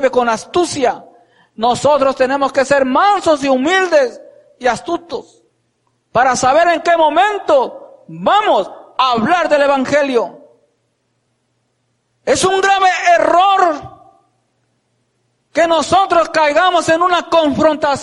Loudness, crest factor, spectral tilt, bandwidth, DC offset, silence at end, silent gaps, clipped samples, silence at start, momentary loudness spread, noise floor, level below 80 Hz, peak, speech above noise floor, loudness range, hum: -13 LUFS; 14 dB; -3.5 dB/octave; 11.5 kHz; under 0.1%; 0 s; none; under 0.1%; 0 s; 9 LU; -65 dBFS; -50 dBFS; -2 dBFS; 52 dB; 3 LU; none